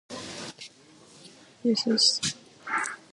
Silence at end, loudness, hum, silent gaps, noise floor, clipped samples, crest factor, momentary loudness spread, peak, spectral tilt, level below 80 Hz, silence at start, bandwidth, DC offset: 0.15 s; -25 LUFS; none; none; -54 dBFS; under 0.1%; 20 dB; 20 LU; -10 dBFS; -2 dB/octave; -68 dBFS; 0.1 s; 11.5 kHz; under 0.1%